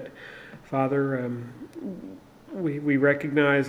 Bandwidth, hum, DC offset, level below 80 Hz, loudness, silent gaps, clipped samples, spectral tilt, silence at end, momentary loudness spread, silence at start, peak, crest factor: 10 kHz; none; under 0.1%; -66 dBFS; -26 LUFS; none; under 0.1%; -8 dB/octave; 0 s; 20 LU; 0 s; -8 dBFS; 18 dB